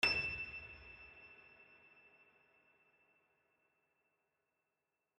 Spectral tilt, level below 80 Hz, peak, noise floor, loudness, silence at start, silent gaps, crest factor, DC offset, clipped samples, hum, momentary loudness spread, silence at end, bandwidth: -2.5 dB/octave; -68 dBFS; -20 dBFS; -89 dBFS; -40 LUFS; 0 s; none; 28 dB; under 0.1%; under 0.1%; none; 26 LU; 3.55 s; 8.4 kHz